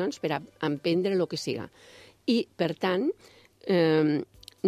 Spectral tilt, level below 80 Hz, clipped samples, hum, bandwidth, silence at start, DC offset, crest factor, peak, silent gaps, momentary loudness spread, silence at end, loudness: -6 dB/octave; -68 dBFS; under 0.1%; none; 14 kHz; 0 s; under 0.1%; 16 dB; -12 dBFS; none; 14 LU; 0 s; -28 LUFS